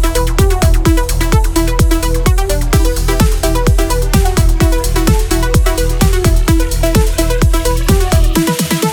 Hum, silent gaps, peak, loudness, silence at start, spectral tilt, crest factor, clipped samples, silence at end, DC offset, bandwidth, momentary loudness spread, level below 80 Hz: none; none; 0 dBFS; -13 LUFS; 0 s; -5 dB/octave; 10 dB; under 0.1%; 0 s; under 0.1%; 19 kHz; 2 LU; -12 dBFS